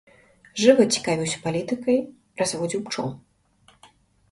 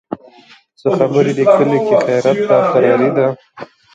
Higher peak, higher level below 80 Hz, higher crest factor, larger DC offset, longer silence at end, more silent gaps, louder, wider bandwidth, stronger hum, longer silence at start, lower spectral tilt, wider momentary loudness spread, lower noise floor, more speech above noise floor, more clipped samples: about the same, -2 dBFS vs 0 dBFS; about the same, -62 dBFS vs -60 dBFS; first, 22 dB vs 14 dB; neither; first, 1.15 s vs 0.3 s; neither; second, -23 LUFS vs -13 LUFS; first, 11.5 kHz vs 8.6 kHz; neither; first, 0.55 s vs 0.1 s; second, -4 dB/octave vs -7 dB/octave; first, 13 LU vs 10 LU; first, -59 dBFS vs -45 dBFS; first, 37 dB vs 33 dB; neither